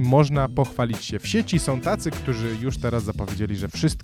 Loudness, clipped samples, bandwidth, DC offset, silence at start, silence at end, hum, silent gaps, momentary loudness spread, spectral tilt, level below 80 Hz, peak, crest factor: -24 LUFS; under 0.1%; 15 kHz; under 0.1%; 0 s; 0 s; none; none; 7 LU; -6 dB/octave; -38 dBFS; -4 dBFS; 20 dB